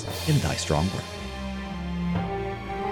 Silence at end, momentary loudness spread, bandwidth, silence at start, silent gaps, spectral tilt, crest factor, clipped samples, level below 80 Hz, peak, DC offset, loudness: 0 s; 9 LU; 19 kHz; 0 s; none; -5.5 dB/octave; 18 dB; under 0.1%; -40 dBFS; -10 dBFS; under 0.1%; -28 LUFS